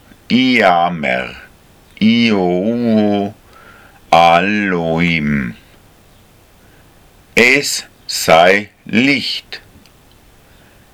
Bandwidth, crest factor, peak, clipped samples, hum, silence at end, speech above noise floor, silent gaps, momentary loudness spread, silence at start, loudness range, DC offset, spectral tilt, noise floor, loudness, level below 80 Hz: 17 kHz; 16 dB; 0 dBFS; under 0.1%; none; 1.35 s; 33 dB; none; 12 LU; 0.3 s; 3 LU; under 0.1%; -4.5 dB/octave; -46 dBFS; -13 LUFS; -46 dBFS